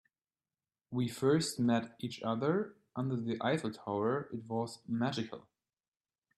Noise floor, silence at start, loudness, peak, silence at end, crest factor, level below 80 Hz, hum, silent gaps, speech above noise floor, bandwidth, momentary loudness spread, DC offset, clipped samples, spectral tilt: under -90 dBFS; 0.9 s; -35 LUFS; -18 dBFS; 0.95 s; 18 dB; -76 dBFS; none; none; over 56 dB; 13 kHz; 10 LU; under 0.1%; under 0.1%; -6 dB/octave